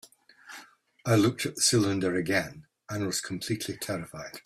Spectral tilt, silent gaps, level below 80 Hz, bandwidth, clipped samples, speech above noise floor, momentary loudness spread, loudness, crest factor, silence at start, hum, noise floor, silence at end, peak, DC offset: -4 dB/octave; none; -64 dBFS; 16 kHz; under 0.1%; 24 dB; 19 LU; -28 LUFS; 20 dB; 0.45 s; none; -52 dBFS; 0.05 s; -10 dBFS; under 0.1%